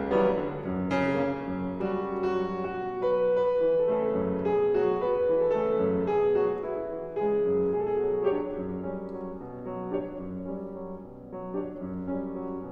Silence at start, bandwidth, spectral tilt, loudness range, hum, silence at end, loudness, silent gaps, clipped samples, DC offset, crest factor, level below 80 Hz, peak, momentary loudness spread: 0 s; 6.4 kHz; -9 dB/octave; 10 LU; none; 0 s; -28 LUFS; none; under 0.1%; under 0.1%; 14 dB; -54 dBFS; -14 dBFS; 12 LU